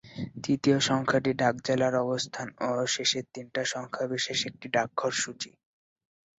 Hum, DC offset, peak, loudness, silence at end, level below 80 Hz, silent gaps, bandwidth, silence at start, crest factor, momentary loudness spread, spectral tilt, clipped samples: none; under 0.1%; -12 dBFS; -28 LUFS; 0.9 s; -66 dBFS; none; 8.4 kHz; 0.05 s; 18 dB; 9 LU; -3.5 dB/octave; under 0.1%